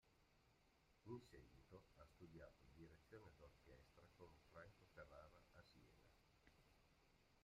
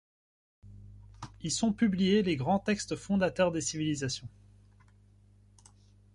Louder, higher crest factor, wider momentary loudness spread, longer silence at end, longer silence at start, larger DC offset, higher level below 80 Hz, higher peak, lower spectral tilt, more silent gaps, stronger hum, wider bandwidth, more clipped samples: second, -66 LUFS vs -30 LUFS; first, 24 dB vs 18 dB; second, 8 LU vs 14 LU; second, 0 s vs 1.85 s; second, 0 s vs 0.65 s; neither; second, -78 dBFS vs -58 dBFS; second, -44 dBFS vs -14 dBFS; about the same, -6 dB/octave vs -5 dB/octave; neither; second, none vs 50 Hz at -50 dBFS; second, 10 kHz vs 11.5 kHz; neither